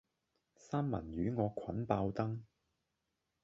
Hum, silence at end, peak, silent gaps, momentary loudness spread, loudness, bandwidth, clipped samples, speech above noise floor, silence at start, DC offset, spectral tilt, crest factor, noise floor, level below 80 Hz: none; 1 s; -16 dBFS; none; 5 LU; -39 LUFS; 7.6 kHz; under 0.1%; 49 dB; 0.65 s; under 0.1%; -8.5 dB/octave; 24 dB; -86 dBFS; -60 dBFS